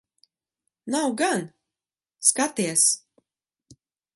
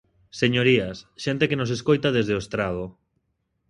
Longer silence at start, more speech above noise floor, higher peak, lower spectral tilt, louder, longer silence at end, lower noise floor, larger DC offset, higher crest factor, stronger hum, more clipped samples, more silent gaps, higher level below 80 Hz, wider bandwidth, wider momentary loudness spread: first, 0.85 s vs 0.35 s; first, over 67 dB vs 51 dB; about the same, -4 dBFS vs -6 dBFS; second, -2 dB/octave vs -6 dB/octave; about the same, -22 LUFS vs -23 LUFS; second, 0.4 s vs 0.8 s; first, under -90 dBFS vs -74 dBFS; neither; first, 24 dB vs 18 dB; neither; neither; neither; second, -76 dBFS vs -52 dBFS; about the same, 12 kHz vs 11 kHz; about the same, 11 LU vs 13 LU